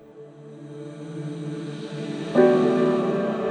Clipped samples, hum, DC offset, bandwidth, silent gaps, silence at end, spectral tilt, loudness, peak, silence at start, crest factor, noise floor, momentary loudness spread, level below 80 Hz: under 0.1%; none; under 0.1%; 9.4 kHz; none; 0 s; -7.5 dB/octave; -23 LUFS; -4 dBFS; 0.05 s; 20 dB; -44 dBFS; 22 LU; -68 dBFS